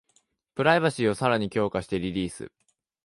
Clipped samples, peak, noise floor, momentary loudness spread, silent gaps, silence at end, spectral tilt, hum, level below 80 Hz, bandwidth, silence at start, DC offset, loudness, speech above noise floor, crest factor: under 0.1%; -8 dBFS; -68 dBFS; 17 LU; none; 0.6 s; -5.5 dB/octave; none; -54 dBFS; 11.5 kHz; 0.55 s; under 0.1%; -25 LUFS; 43 dB; 20 dB